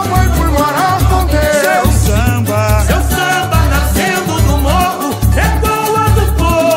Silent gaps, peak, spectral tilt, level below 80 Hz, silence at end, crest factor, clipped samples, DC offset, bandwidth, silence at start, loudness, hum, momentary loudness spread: none; 0 dBFS; -5 dB/octave; -16 dBFS; 0 s; 10 dB; under 0.1%; under 0.1%; 16.5 kHz; 0 s; -12 LUFS; none; 2 LU